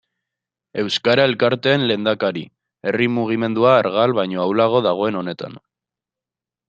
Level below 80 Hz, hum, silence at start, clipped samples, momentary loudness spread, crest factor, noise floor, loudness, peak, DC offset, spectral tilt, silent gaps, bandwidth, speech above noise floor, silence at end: -64 dBFS; none; 0.75 s; under 0.1%; 13 LU; 18 dB; -88 dBFS; -18 LUFS; -2 dBFS; under 0.1%; -6 dB/octave; none; 8.4 kHz; 70 dB; 1.1 s